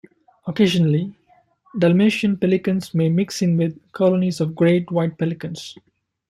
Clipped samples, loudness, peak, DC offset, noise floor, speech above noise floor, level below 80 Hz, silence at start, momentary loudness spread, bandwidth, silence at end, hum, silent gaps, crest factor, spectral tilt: under 0.1%; -19 LUFS; -4 dBFS; under 0.1%; -57 dBFS; 38 dB; -60 dBFS; 0.45 s; 14 LU; 13.5 kHz; 0.55 s; none; none; 16 dB; -7 dB/octave